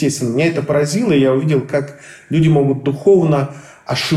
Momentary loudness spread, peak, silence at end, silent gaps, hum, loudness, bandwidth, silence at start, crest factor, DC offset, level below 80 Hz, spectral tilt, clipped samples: 9 LU; -2 dBFS; 0 s; none; none; -15 LUFS; 13.5 kHz; 0 s; 14 dB; under 0.1%; -50 dBFS; -6.5 dB/octave; under 0.1%